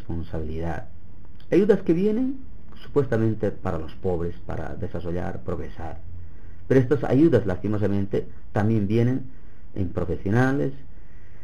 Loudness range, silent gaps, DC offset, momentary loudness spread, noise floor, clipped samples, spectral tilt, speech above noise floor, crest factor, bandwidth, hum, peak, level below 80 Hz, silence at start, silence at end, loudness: 6 LU; none; 4%; 15 LU; -46 dBFS; under 0.1%; -9 dB/octave; 23 dB; 20 dB; 10 kHz; none; -4 dBFS; -42 dBFS; 0 s; 0.05 s; -25 LUFS